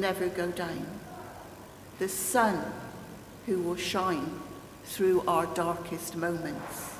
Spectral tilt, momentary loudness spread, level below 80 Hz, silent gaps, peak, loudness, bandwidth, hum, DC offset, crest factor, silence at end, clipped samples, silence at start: -4 dB/octave; 19 LU; -58 dBFS; none; -12 dBFS; -31 LUFS; 16 kHz; none; under 0.1%; 20 dB; 0 s; under 0.1%; 0 s